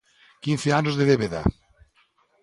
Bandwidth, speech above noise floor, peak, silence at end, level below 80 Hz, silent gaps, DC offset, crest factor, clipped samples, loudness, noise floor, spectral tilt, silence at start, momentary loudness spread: 11.5 kHz; 42 dB; -6 dBFS; 0.9 s; -42 dBFS; none; under 0.1%; 18 dB; under 0.1%; -23 LUFS; -64 dBFS; -6 dB/octave; 0.45 s; 7 LU